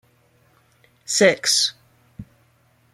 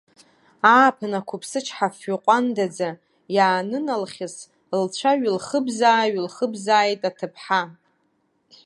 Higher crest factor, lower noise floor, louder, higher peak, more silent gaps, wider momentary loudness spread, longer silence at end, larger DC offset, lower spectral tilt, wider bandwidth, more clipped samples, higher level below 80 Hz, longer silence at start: about the same, 22 dB vs 22 dB; second, -60 dBFS vs -68 dBFS; first, -18 LUFS vs -21 LUFS; about the same, -2 dBFS vs -2 dBFS; neither; about the same, 10 LU vs 12 LU; second, 0.7 s vs 0.95 s; neither; second, -1.5 dB/octave vs -4 dB/octave; first, 15.5 kHz vs 11.5 kHz; neither; first, -62 dBFS vs -76 dBFS; first, 1.1 s vs 0.65 s